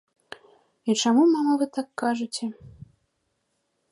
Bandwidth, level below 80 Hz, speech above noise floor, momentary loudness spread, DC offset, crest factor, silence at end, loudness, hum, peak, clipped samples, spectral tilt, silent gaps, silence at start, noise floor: 11.5 kHz; -66 dBFS; 52 dB; 26 LU; under 0.1%; 16 dB; 1.25 s; -24 LUFS; none; -10 dBFS; under 0.1%; -4 dB/octave; none; 0.85 s; -75 dBFS